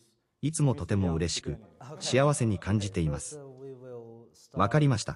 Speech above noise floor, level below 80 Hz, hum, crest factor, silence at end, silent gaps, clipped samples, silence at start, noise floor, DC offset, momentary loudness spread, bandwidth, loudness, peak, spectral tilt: 24 dB; -50 dBFS; none; 20 dB; 0 s; none; under 0.1%; 0.45 s; -52 dBFS; under 0.1%; 20 LU; 12 kHz; -28 LUFS; -10 dBFS; -5.5 dB/octave